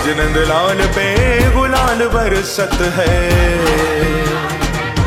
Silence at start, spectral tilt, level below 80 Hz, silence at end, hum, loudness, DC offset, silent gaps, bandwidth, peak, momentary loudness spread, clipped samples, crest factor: 0 s; -5 dB/octave; -20 dBFS; 0 s; none; -14 LUFS; under 0.1%; none; 16.5 kHz; -2 dBFS; 5 LU; under 0.1%; 12 dB